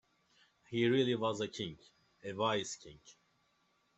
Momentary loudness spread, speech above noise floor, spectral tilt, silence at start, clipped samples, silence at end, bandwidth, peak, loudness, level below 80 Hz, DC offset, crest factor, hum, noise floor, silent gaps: 17 LU; 40 dB; -5 dB/octave; 0.7 s; under 0.1%; 0.85 s; 8.2 kHz; -18 dBFS; -35 LUFS; -74 dBFS; under 0.1%; 20 dB; none; -76 dBFS; none